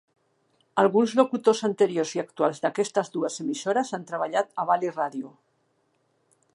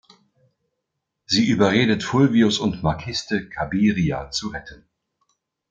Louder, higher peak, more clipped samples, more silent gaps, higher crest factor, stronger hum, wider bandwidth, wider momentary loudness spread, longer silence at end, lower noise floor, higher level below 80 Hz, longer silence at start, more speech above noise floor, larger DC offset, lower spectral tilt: second, -25 LUFS vs -20 LUFS; about the same, -4 dBFS vs -4 dBFS; neither; neither; about the same, 22 dB vs 18 dB; neither; first, 11.5 kHz vs 8.8 kHz; about the same, 9 LU vs 10 LU; first, 1.25 s vs 0.95 s; second, -70 dBFS vs -79 dBFS; second, -80 dBFS vs -48 dBFS; second, 0.75 s vs 1.3 s; second, 45 dB vs 59 dB; neither; about the same, -4.5 dB/octave vs -5.5 dB/octave